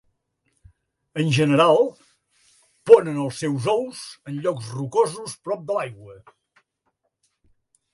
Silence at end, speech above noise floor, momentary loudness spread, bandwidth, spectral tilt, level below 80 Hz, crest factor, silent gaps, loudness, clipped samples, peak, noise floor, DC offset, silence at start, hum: 1.8 s; 53 dB; 18 LU; 11.5 kHz; -6 dB/octave; -66 dBFS; 22 dB; none; -21 LUFS; under 0.1%; 0 dBFS; -74 dBFS; under 0.1%; 1.15 s; none